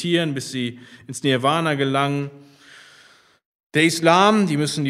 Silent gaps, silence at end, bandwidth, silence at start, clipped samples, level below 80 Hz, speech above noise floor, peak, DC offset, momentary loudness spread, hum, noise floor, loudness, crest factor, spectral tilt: 3.45-3.70 s; 0 s; 15.5 kHz; 0 s; under 0.1%; -68 dBFS; 33 dB; 0 dBFS; under 0.1%; 13 LU; none; -53 dBFS; -19 LUFS; 20 dB; -5 dB/octave